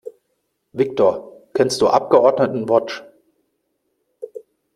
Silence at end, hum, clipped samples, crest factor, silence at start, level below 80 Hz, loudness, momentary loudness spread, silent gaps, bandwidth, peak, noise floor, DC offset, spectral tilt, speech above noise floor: 0.35 s; none; under 0.1%; 18 dB; 0.05 s; -62 dBFS; -17 LUFS; 22 LU; none; 13.5 kHz; -2 dBFS; -71 dBFS; under 0.1%; -5 dB/octave; 55 dB